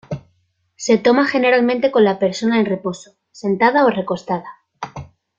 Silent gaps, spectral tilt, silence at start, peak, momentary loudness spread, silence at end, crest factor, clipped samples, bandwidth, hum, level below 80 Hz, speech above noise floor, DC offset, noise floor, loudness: none; -5.5 dB/octave; 0.1 s; -2 dBFS; 18 LU; 0.35 s; 16 dB; under 0.1%; 7.8 kHz; none; -58 dBFS; 48 dB; under 0.1%; -64 dBFS; -17 LUFS